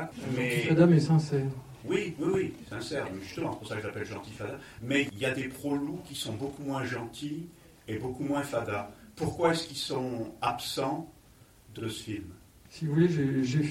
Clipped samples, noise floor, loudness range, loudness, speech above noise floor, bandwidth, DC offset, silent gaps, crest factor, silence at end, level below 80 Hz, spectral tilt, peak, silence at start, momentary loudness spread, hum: under 0.1%; -57 dBFS; 7 LU; -31 LUFS; 27 dB; 16 kHz; under 0.1%; none; 20 dB; 0 s; -60 dBFS; -6 dB/octave; -10 dBFS; 0 s; 14 LU; none